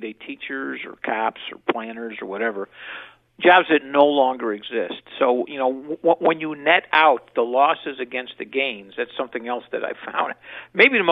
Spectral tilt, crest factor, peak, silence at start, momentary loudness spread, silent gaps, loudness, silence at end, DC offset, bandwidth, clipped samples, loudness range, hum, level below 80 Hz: -7 dB/octave; 20 dB; 0 dBFS; 0 s; 15 LU; none; -21 LUFS; 0 s; under 0.1%; 5.6 kHz; under 0.1%; 5 LU; none; -70 dBFS